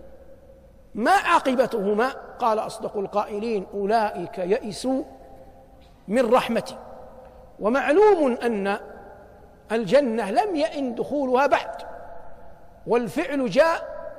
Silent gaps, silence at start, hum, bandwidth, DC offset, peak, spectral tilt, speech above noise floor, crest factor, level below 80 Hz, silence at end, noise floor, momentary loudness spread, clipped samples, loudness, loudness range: none; 0.05 s; none; 15 kHz; under 0.1%; -6 dBFS; -5 dB/octave; 27 dB; 18 dB; -54 dBFS; 0 s; -49 dBFS; 18 LU; under 0.1%; -23 LUFS; 4 LU